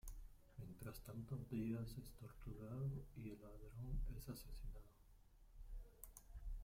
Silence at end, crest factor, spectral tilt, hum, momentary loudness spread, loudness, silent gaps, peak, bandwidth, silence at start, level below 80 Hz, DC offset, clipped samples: 0 s; 16 dB; -7 dB/octave; none; 14 LU; -53 LUFS; none; -34 dBFS; 16.5 kHz; 0.05 s; -56 dBFS; under 0.1%; under 0.1%